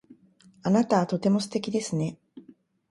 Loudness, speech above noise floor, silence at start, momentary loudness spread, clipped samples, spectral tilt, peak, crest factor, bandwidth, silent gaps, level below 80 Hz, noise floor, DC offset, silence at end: -26 LUFS; 33 dB; 0.1 s; 9 LU; under 0.1%; -6 dB/octave; -10 dBFS; 18 dB; 11.5 kHz; none; -68 dBFS; -58 dBFS; under 0.1%; 0.5 s